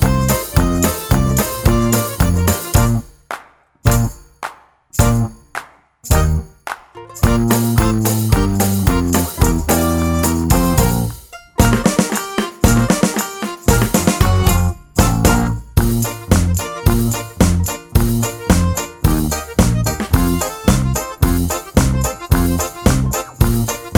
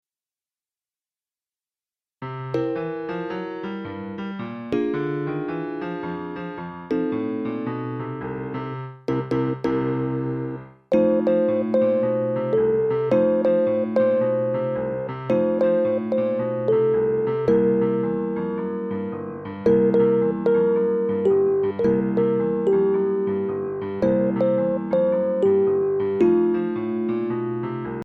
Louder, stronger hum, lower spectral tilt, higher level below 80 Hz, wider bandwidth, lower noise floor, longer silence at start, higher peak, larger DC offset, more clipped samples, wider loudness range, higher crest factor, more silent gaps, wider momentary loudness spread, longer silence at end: first, -16 LUFS vs -23 LUFS; neither; second, -5.5 dB/octave vs -10 dB/octave; first, -22 dBFS vs -58 dBFS; first, over 20 kHz vs 5.8 kHz; second, -42 dBFS vs under -90 dBFS; second, 0 s vs 2.2 s; first, 0 dBFS vs -8 dBFS; neither; neither; second, 4 LU vs 8 LU; about the same, 16 dB vs 14 dB; neither; about the same, 9 LU vs 11 LU; about the same, 0 s vs 0 s